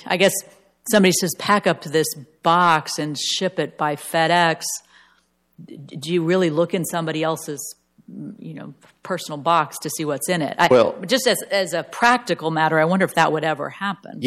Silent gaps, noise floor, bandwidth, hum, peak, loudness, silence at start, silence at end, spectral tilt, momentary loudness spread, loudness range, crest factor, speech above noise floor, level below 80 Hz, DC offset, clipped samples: none; -62 dBFS; 16 kHz; none; -4 dBFS; -20 LUFS; 0 s; 0 s; -4 dB/octave; 15 LU; 6 LU; 16 dB; 42 dB; -66 dBFS; under 0.1%; under 0.1%